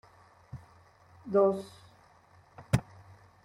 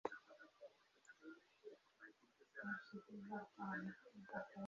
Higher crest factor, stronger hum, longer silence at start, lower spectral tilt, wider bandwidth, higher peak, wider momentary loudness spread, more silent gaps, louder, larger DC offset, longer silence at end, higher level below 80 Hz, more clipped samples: about the same, 24 dB vs 26 dB; neither; first, 0.55 s vs 0.05 s; first, -7.5 dB/octave vs -5 dB/octave; first, 16 kHz vs 7.2 kHz; first, -10 dBFS vs -28 dBFS; first, 24 LU vs 15 LU; neither; first, -30 LUFS vs -54 LUFS; neither; first, 0.6 s vs 0 s; first, -56 dBFS vs -90 dBFS; neither